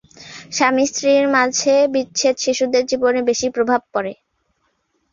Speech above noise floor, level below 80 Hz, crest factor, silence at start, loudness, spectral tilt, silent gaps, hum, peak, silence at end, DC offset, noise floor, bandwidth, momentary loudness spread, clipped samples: 50 dB; -60 dBFS; 16 dB; 0.2 s; -17 LUFS; -2 dB/octave; none; none; -2 dBFS; 1 s; under 0.1%; -67 dBFS; 7.4 kHz; 9 LU; under 0.1%